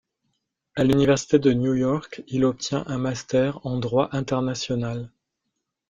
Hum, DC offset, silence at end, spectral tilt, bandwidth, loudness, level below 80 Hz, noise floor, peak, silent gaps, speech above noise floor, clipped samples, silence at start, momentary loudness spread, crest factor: none; under 0.1%; 0.8 s; -6 dB/octave; 9 kHz; -23 LUFS; -52 dBFS; -80 dBFS; -4 dBFS; none; 58 dB; under 0.1%; 0.75 s; 10 LU; 18 dB